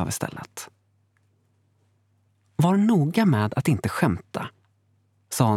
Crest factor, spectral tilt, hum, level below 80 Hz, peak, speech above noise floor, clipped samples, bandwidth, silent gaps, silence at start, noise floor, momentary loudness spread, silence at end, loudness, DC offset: 22 dB; -6.5 dB/octave; none; -56 dBFS; -4 dBFS; 44 dB; under 0.1%; 16.5 kHz; none; 0 s; -66 dBFS; 18 LU; 0 s; -23 LUFS; under 0.1%